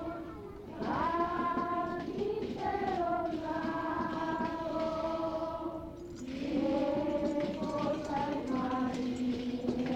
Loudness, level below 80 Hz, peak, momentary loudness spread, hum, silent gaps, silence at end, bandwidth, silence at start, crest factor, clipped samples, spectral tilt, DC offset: -34 LUFS; -56 dBFS; -20 dBFS; 8 LU; none; none; 0 s; 9.8 kHz; 0 s; 14 dB; under 0.1%; -6.5 dB/octave; under 0.1%